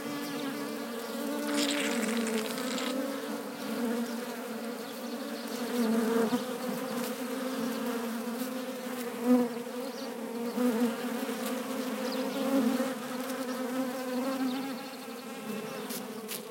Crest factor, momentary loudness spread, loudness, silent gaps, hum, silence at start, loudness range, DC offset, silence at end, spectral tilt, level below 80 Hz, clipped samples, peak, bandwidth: 18 dB; 9 LU; -33 LUFS; none; none; 0 s; 3 LU; under 0.1%; 0 s; -3.5 dB/octave; -84 dBFS; under 0.1%; -14 dBFS; 17 kHz